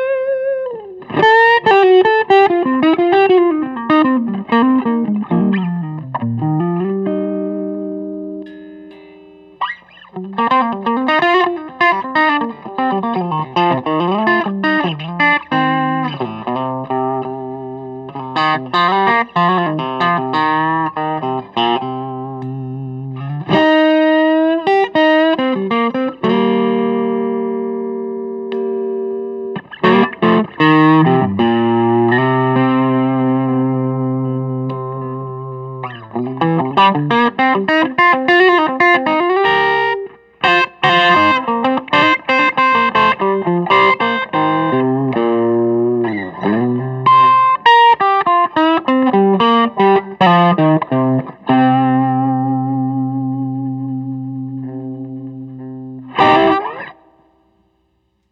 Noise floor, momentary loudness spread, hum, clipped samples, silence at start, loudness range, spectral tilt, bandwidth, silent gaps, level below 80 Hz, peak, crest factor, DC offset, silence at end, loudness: -63 dBFS; 15 LU; none; under 0.1%; 0 s; 8 LU; -7.5 dB/octave; 7.4 kHz; none; -58 dBFS; 0 dBFS; 14 dB; under 0.1%; 1.4 s; -14 LUFS